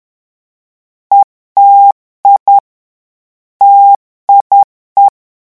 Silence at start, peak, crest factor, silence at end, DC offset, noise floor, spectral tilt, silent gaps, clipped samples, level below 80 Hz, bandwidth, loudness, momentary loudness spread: 1.1 s; 0 dBFS; 10 dB; 0.4 s; 0.3%; under -90 dBFS; -4 dB/octave; 1.24-1.55 s, 1.92-2.23 s, 2.40-2.46 s, 2.60-3.60 s, 3.96-4.27 s, 4.41-4.50 s, 4.64-4.96 s; 0.5%; -64 dBFS; 1.6 kHz; -8 LUFS; 7 LU